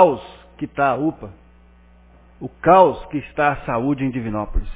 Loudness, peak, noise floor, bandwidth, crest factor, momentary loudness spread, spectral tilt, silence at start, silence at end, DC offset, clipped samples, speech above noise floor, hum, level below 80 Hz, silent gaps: -19 LUFS; 0 dBFS; -49 dBFS; 4 kHz; 20 dB; 21 LU; -11 dB/octave; 0 s; 0 s; under 0.1%; under 0.1%; 31 dB; 60 Hz at -50 dBFS; -34 dBFS; none